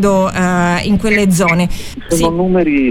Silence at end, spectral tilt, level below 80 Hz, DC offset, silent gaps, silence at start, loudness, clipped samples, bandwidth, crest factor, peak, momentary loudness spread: 0 s; -5.5 dB/octave; -30 dBFS; under 0.1%; none; 0 s; -13 LUFS; under 0.1%; 17 kHz; 10 dB; -2 dBFS; 6 LU